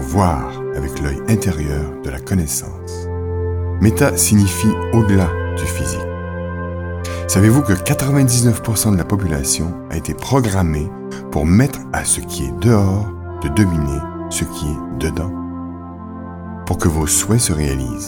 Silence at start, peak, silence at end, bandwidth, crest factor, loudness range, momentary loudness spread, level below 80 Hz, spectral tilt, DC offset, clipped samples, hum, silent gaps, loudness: 0 s; -2 dBFS; 0 s; 19.5 kHz; 16 dB; 5 LU; 12 LU; -30 dBFS; -5.5 dB/octave; under 0.1%; under 0.1%; none; none; -17 LUFS